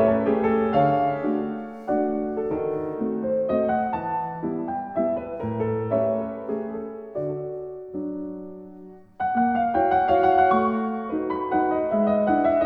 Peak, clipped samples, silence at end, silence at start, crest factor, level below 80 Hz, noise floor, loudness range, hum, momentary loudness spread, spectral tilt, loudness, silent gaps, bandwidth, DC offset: -6 dBFS; under 0.1%; 0 s; 0 s; 18 dB; -54 dBFS; -44 dBFS; 7 LU; none; 13 LU; -10 dB/octave; -24 LUFS; none; 5.4 kHz; under 0.1%